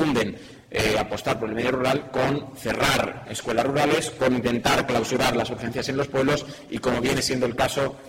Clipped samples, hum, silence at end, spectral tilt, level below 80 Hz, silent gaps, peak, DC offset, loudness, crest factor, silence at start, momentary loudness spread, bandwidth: under 0.1%; none; 0 s; -4.5 dB/octave; -48 dBFS; none; -6 dBFS; under 0.1%; -24 LUFS; 18 dB; 0 s; 7 LU; 16.5 kHz